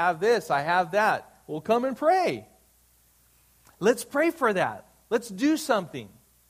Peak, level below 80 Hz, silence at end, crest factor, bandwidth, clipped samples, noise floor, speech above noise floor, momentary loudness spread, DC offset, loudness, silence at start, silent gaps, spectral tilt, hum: -8 dBFS; -68 dBFS; 0.4 s; 18 dB; 15.5 kHz; under 0.1%; -62 dBFS; 37 dB; 13 LU; under 0.1%; -25 LUFS; 0 s; none; -4.5 dB/octave; 60 Hz at -60 dBFS